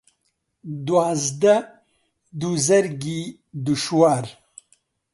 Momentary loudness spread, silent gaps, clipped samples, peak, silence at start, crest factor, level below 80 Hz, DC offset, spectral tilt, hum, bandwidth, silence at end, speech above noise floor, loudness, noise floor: 18 LU; none; under 0.1%; -4 dBFS; 0.65 s; 18 dB; -64 dBFS; under 0.1%; -4.5 dB/octave; none; 11.5 kHz; 0.8 s; 52 dB; -21 LUFS; -72 dBFS